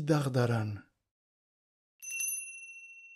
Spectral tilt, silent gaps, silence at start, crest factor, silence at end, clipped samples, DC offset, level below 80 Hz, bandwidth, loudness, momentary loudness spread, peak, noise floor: -5 dB/octave; 1.11-1.99 s; 0 s; 20 dB; 0 s; under 0.1%; under 0.1%; -72 dBFS; 15.5 kHz; -33 LUFS; 17 LU; -16 dBFS; under -90 dBFS